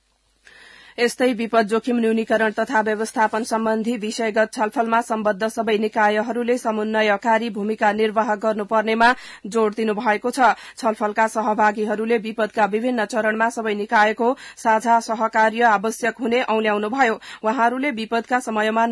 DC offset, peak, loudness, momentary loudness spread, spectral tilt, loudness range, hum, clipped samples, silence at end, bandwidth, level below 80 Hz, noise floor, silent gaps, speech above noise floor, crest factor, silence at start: under 0.1%; -4 dBFS; -20 LUFS; 5 LU; -4.5 dB/octave; 2 LU; none; under 0.1%; 0 s; 12 kHz; -64 dBFS; -55 dBFS; none; 36 dB; 16 dB; 1 s